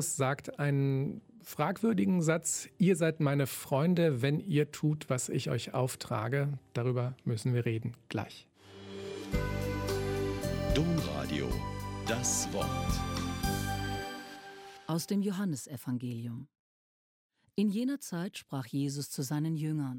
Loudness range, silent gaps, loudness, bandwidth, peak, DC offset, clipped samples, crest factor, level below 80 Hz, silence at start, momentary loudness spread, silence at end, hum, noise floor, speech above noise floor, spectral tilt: 7 LU; 16.59-17.30 s; -33 LUFS; 17 kHz; -14 dBFS; under 0.1%; under 0.1%; 18 dB; -48 dBFS; 0 s; 11 LU; 0 s; none; under -90 dBFS; over 58 dB; -5.5 dB/octave